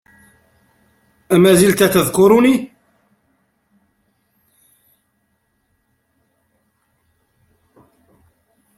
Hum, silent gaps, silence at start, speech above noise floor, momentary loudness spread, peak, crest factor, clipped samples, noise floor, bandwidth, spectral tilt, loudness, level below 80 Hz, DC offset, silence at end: none; none; 1.3 s; 55 dB; 8 LU; 0 dBFS; 20 dB; under 0.1%; -66 dBFS; 16.5 kHz; -5 dB/octave; -13 LUFS; -52 dBFS; under 0.1%; 6.1 s